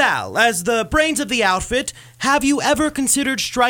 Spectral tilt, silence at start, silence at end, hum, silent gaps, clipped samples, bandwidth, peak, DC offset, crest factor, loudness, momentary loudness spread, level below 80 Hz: -2.5 dB/octave; 0 s; 0 s; none; none; under 0.1%; 19 kHz; -2 dBFS; under 0.1%; 16 dB; -17 LUFS; 5 LU; -40 dBFS